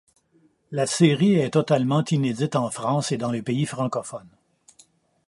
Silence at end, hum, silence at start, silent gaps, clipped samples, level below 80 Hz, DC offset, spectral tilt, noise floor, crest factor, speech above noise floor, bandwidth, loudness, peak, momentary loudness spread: 1 s; none; 0.7 s; none; under 0.1%; -66 dBFS; under 0.1%; -6 dB/octave; -62 dBFS; 20 dB; 40 dB; 11.5 kHz; -23 LUFS; -4 dBFS; 9 LU